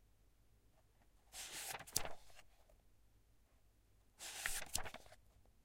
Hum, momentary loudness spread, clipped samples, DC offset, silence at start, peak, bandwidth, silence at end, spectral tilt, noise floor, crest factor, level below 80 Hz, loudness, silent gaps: none; 21 LU; under 0.1%; under 0.1%; 0.15 s; -16 dBFS; 16 kHz; 0 s; -0.5 dB/octave; -72 dBFS; 34 dB; -62 dBFS; -46 LUFS; none